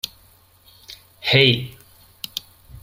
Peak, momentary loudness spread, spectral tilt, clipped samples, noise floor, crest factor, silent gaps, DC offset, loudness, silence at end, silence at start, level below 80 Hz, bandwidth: 0 dBFS; 27 LU; -4.5 dB/octave; under 0.1%; -53 dBFS; 24 dB; none; under 0.1%; -18 LUFS; 0.05 s; 0.05 s; -52 dBFS; 16.5 kHz